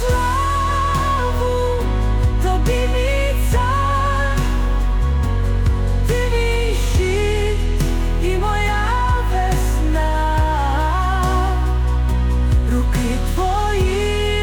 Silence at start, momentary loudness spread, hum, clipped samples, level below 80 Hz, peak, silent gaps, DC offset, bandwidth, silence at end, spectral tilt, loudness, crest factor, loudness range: 0 s; 2 LU; none; under 0.1%; -18 dBFS; -6 dBFS; none; under 0.1%; 18 kHz; 0 s; -5.5 dB/octave; -19 LUFS; 10 dB; 1 LU